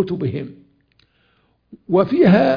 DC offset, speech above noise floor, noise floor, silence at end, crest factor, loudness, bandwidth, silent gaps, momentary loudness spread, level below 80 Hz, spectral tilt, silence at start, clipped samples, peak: under 0.1%; 46 dB; -62 dBFS; 0 s; 16 dB; -17 LUFS; 5.2 kHz; none; 17 LU; -54 dBFS; -9.5 dB/octave; 0 s; under 0.1%; -2 dBFS